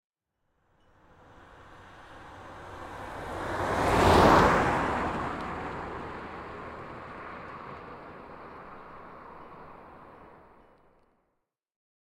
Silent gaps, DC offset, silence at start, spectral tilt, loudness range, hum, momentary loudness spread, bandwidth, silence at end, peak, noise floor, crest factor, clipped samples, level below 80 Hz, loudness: none; under 0.1%; 1.6 s; -5.5 dB/octave; 22 LU; none; 27 LU; 16.5 kHz; 1.7 s; -8 dBFS; -80 dBFS; 24 dB; under 0.1%; -46 dBFS; -26 LUFS